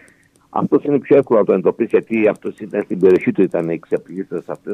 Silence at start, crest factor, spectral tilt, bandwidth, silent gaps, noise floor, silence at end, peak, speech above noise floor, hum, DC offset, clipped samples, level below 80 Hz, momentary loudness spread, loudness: 0.55 s; 16 dB; -9 dB/octave; 9.8 kHz; none; -52 dBFS; 0 s; -2 dBFS; 35 dB; none; under 0.1%; under 0.1%; -62 dBFS; 13 LU; -17 LUFS